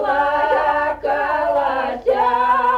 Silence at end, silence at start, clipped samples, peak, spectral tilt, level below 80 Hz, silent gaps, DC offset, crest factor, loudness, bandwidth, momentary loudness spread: 0 s; 0 s; under 0.1%; -6 dBFS; -5 dB/octave; -46 dBFS; none; under 0.1%; 12 dB; -18 LUFS; 13 kHz; 4 LU